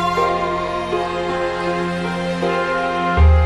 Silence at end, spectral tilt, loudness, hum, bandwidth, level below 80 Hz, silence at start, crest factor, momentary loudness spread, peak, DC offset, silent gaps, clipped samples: 0 s; -6.5 dB/octave; -19 LUFS; none; 10.5 kHz; -24 dBFS; 0 s; 14 dB; 5 LU; -4 dBFS; under 0.1%; none; under 0.1%